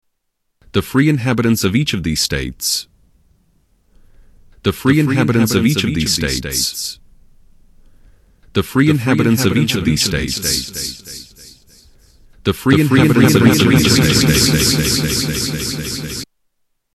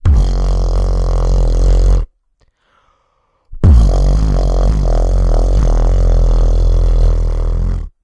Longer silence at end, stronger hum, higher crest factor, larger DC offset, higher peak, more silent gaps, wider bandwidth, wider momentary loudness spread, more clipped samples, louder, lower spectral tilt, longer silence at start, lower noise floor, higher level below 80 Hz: first, 0.7 s vs 0.15 s; neither; first, 16 dB vs 10 dB; neither; about the same, -2 dBFS vs 0 dBFS; neither; first, 14.5 kHz vs 7.2 kHz; first, 12 LU vs 7 LU; neither; about the same, -15 LUFS vs -15 LUFS; second, -4.5 dB/octave vs -7.5 dB/octave; first, 0.75 s vs 0.05 s; first, -70 dBFS vs -60 dBFS; second, -36 dBFS vs -12 dBFS